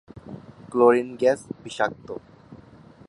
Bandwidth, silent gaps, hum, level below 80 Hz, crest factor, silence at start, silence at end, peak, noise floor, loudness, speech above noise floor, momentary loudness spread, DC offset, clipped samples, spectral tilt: 11.5 kHz; none; none; -62 dBFS; 22 dB; 0.15 s; 0.55 s; -4 dBFS; -49 dBFS; -22 LUFS; 26 dB; 23 LU; under 0.1%; under 0.1%; -5.5 dB/octave